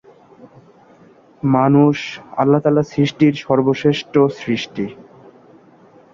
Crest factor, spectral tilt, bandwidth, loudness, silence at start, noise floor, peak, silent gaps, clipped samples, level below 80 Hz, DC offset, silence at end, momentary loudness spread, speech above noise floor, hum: 16 dB; -7.5 dB/octave; 7.2 kHz; -17 LUFS; 1.45 s; -48 dBFS; -2 dBFS; none; under 0.1%; -56 dBFS; under 0.1%; 1.1 s; 11 LU; 32 dB; none